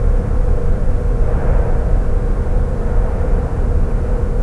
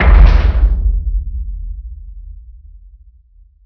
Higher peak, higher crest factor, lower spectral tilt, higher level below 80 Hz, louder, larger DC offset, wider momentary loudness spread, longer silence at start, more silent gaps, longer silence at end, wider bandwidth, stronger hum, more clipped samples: about the same, -2 dBFS vs 0 dBFS; about the same, 12 dB vs 14 dB; about the same, -9 dB/octave vs -8.5 dB/octave; about the same, -14 dBFS vs -14 dBFS; second, -19 LUFS vs -15 LUFS; first, 0.7% vs under 0.1%; second, 2 LU vs 25 LU; about the same, 0 s vs 0 s; neither; second, 0 s vs 1.15 s; second, 3 kHz vs 5.4 kHz; neither; second, under 0.1% vs 1%